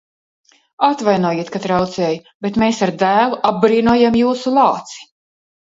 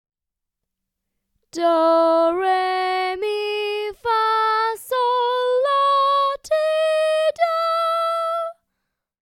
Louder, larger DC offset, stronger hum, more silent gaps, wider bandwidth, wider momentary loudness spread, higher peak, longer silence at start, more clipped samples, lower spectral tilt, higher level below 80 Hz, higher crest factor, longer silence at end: first, -16 LUFS vs -20 LUFS; neither; neither; first, 2.35-2.40 s vs none; second, 7.8 kHz vs 16 kHz; about the same, 9 LU vs 7 LU; first, 0 dBFS vs -6 dBFS; second, 0.8 s vs 1.55 s; neither; first, -6 dB/octave vs -2 dB/octave; first, -50 dBFS vs -66 dBFS; about the same, 16 dB vs 14 dB; about the same, 0.65 s vs 0.75 s